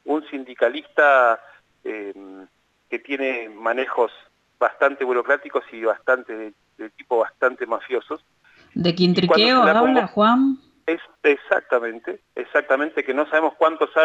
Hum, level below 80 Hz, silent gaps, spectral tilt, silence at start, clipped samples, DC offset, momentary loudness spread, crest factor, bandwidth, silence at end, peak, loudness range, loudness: none; -66 dBFS; none; -6.5 dB/octave; 0.05 s; under 0.1%; under 0.1%; 18 LU; 18 dB; 8 kHz; 0 s; -4 dBFS; 7 LU; -20 LUFS